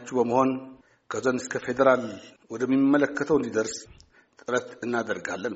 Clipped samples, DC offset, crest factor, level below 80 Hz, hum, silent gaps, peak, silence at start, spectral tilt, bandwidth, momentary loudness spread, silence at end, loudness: under 0.1%; under 0.1%; 20 dB; -62 dBFS; none; none; -6 dBFS; 0 s; -4.5 dB/octave; 8 kHz; 15 LU; 0 s; -26 LUFS